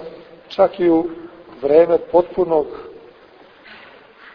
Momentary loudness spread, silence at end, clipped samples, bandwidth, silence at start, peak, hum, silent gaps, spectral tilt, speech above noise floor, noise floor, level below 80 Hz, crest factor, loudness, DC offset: 22 LU; 1.45 s; under 0.1%; 5.4 kHz; 0 s; 0 dBFS; none; none; -8.5 dB/octave; 31 dB; -46 dBFS; -54 dBFS; 18 dB; -17 LUFS; under 0.1%